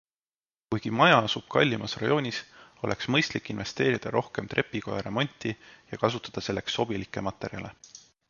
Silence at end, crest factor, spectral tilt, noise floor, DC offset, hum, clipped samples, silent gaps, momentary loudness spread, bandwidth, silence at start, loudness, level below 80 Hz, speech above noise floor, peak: 0.3 s; 22 dB; -5 dB/octave; under -90 dBFS; under 0.1%; none; under 0.1%; none; 13 LU; 7.4 kHz; 0.7 s; -28 LUFS; -58 dBFS; over 62 dB; -6 dBFS